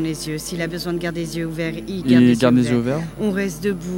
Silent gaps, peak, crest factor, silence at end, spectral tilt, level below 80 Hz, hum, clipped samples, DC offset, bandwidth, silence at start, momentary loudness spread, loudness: none; -2 dBFS; 18 dB; 0 s; -6 dB/octave; -44 dBFS; none; under 0.1%; under 0.1%; 16.5 kHz; 0 s; 11 LU; -20 LUFS